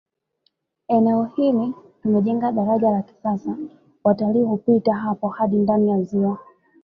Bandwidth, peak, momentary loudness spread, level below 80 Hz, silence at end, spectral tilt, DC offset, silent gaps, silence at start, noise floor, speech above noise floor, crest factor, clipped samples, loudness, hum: 5.2 kHz; -4 dBFS; 9 LU; -62 dBFS; 0.4 s; -10.5 dB/octave; under 0.1%; none; 0.9 s; -69 dBFS; 50 dB; 16 dB; under 0.1%; -21 LUFS; none